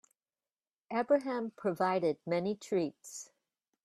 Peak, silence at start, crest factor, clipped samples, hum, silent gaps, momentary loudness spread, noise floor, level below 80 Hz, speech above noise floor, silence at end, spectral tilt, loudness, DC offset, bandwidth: -16 dBFS; 0.9 s; 18 dB; under 0.1%; none; none; 16 LU; under -90 dBFS; -80 dBFS; over 57 dB; 0.6 s; -5.5 dB/octave; -33 LUFS; under 0.1%; 13.5 kHz